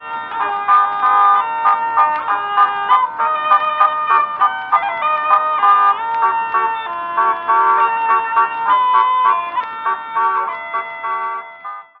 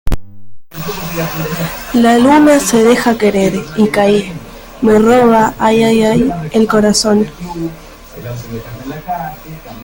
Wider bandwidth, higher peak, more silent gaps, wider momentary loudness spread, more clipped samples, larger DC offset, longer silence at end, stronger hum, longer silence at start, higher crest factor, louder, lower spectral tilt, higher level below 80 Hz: second, 5 kHz vs 17 kHz; about the same, 0 dBFS vs 0 dBFS; neither; second, 9 LU vs 18 LU; neither; neither; first, 0.2 s vs 0 s; neither; about the same, 0 s vs 0.05 s; about the same, 16 dB vs 12 dB; second, -15 LUFS vs -11 LUFS; about the same, -4.5 dB/octave vs -5 dB/octave; second, -66 dBFS vs -32 dBFS